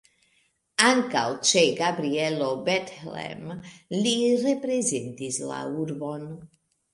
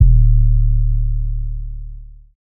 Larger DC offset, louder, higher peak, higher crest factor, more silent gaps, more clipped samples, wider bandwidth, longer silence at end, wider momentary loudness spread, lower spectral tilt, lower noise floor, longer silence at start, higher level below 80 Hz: neither; second, -25 LUFS vs -18 LUFS; about the same, -2 dBFS vs 0 dBFS; first, 24 dB vs 14 dB; neither; neither; first, 11.5 kHz vs 0.4 kHz; first, 0.5 s vs 0.1 s; about the same, 17 LU vs 19 LU; second, -3 dB/octave vs -16.5 dB/octave; first, -68 dBFS vs -33 dBFS; first, 0.8 s vs 0 s; second, -68 dBFS vs -14 dBFS